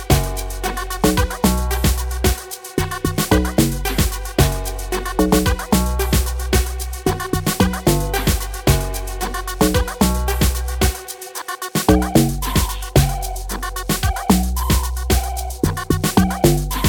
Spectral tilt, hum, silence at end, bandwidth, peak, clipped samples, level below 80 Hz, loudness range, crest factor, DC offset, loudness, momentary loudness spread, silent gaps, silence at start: -5 dB/octave; none; 0 s; 18.5 kHz; 0 dBFS; under 0.1%; -24 dBFS; 1 LU; 18 dB; under 0.1%; -19 LUFS; 9 LU; none; 0 s